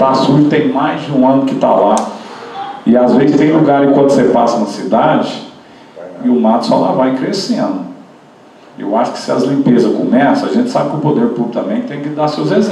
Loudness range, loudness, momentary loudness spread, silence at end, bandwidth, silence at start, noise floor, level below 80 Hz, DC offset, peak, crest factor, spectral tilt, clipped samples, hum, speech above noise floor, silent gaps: 4 LU; -12 LUFS; 12 LU; 0 s; 11 kHz; 0 s; -40 dBFS; -56 dBFS; under 0.1%; 0 dBFS; 12 dB; -6.5 dB/octave; under 0.1%; none; 29 dB; none